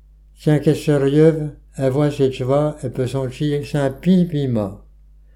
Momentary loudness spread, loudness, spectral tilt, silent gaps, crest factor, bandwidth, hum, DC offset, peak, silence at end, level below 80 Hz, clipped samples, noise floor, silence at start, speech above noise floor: 9 LU; -19 LUFS; -8 dB/octave; none; 16 dB; 13.5 kHz; none; under 0.1%; -2 dBFS; 0.55 s; -44 dBFS; under 0.1%; -46 dBFS; 0.4 s; 29 dB